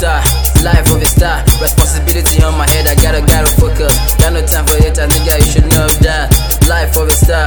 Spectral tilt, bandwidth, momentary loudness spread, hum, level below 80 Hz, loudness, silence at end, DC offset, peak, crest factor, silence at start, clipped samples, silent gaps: -4 dB/octave; over 20 kHz; 2 LU; none; -12 dBFS; -10 LUFS; 0 s; under 0.1%; 0 dBFS; 8 dB; 0 s; 0.7%; none